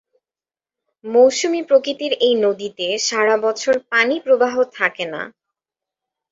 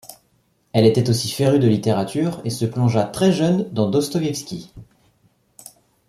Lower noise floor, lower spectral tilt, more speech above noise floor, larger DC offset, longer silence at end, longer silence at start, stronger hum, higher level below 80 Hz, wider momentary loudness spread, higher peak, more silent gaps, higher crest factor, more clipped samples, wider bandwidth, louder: first, under -90 dBFS vs -63 dBFS; second, -2 dB/octave vs -6.5 dB/octave; first, over 73 dB vs 45 dB; neither; second, 1.05 s vs 1.25 s; first, 1.05 s vs 0.1 s; neither; second, -68 dBFS vs -56 dBFS; first, 11 LU vs 8 LU; about the same, -2 dBFS vs -2 dBFS; neither; about the same, 18 dB vs 18 dB; neither; second, 7.8 kHz vs 15 kHz; about the same, -17 LUFS vs -19 LUFS